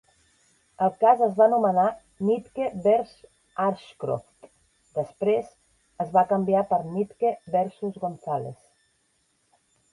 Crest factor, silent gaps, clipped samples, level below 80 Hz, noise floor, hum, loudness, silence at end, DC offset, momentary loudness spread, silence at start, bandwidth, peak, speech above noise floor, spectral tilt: 20 dB; none; under 0.1%; -66 dBFS; -69 dBFS; none; -25 LUFS; 1.4 s; under 0.1%; 13 LU; 0.8 s; 11.5 kHz; -6 dBFS; 46 dB; -8 dB/octave